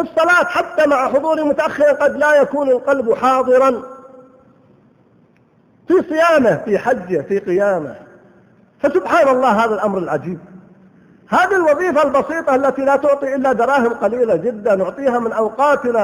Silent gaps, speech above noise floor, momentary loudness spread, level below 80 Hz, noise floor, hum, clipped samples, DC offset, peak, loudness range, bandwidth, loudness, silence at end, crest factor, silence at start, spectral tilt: none; 38 dB; 6 LU; -56 dBFS; -53 dBFS; none; under 0.1%; under 0.1%; -2 dBFS; 4 LU; 18.5 kHz; -15 LUFS; 0 s; 14 dB; 0 s; -5.5 dB/octave